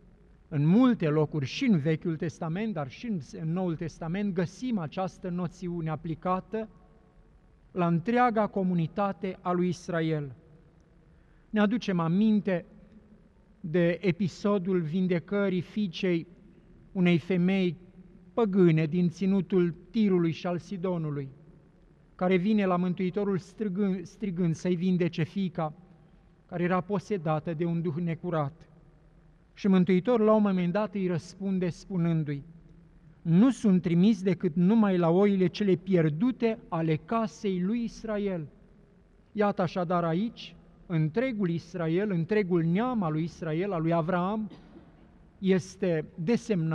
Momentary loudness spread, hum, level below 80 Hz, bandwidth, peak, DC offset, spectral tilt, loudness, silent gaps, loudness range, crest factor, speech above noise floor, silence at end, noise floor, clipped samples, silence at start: 11 LU; none; -60 dBFS; 9 kHz; -12 dBFS; under 0.1%; -8 dB/octave; -28 LUFS; none; 6 LU; 16 dB; 32 dB; 0 s; -59 dBFS; under 0.1%; 0.5 s